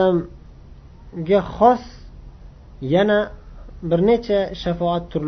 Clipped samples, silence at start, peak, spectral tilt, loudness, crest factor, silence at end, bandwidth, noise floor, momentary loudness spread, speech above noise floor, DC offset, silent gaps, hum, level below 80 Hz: under 0.1%; 0 s; -2 dBFS; -8 dB/octave; -19 LUFS; 18 dB; 0 s; 6.4 kHz; -42 dBFS; 16 LU; 24 dB; under 0.1%; none; none; -40 dBFS